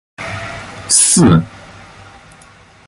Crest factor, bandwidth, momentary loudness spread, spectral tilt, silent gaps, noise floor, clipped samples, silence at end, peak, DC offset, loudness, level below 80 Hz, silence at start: 16 dB; 11.5 kHz; 20 LU; -4 dB/octave; none; -43 dBFS; under 0.1%; 0.85 s; 0 dBFS; under 0.1%; -10 LUFS; -38 dBFS; 0.2 s